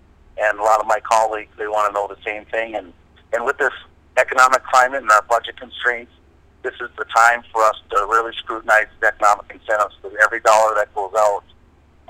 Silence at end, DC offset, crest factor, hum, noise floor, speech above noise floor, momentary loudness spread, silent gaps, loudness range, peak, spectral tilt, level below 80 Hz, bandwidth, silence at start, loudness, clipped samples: 0.7 s; under 0.1%; 18 dB; none; -51 dBFS; 33 dB; 14 LU; none; 3 LU; 0 dBFS; -1.5 dB/octave; -52 dBFS; 17.5 kHz; 0.35 s; -18 LUFS; under 0.1%